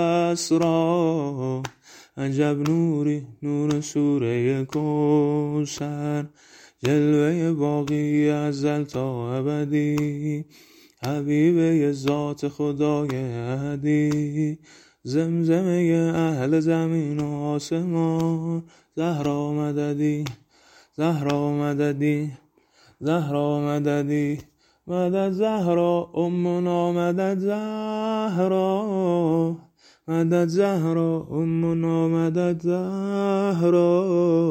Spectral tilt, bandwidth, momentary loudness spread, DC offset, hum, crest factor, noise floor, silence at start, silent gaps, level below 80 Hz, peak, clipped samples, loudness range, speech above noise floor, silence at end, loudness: -7.5 dB/octave; 15.5 kHz; 8 LU; under 0.1%; none; 18 dB; -58 dBFS; 0 s; none; -62 dBFS; -4 dBFS; under 0.1%; 3 LU; 35 dB; 0 s; -23 LUFS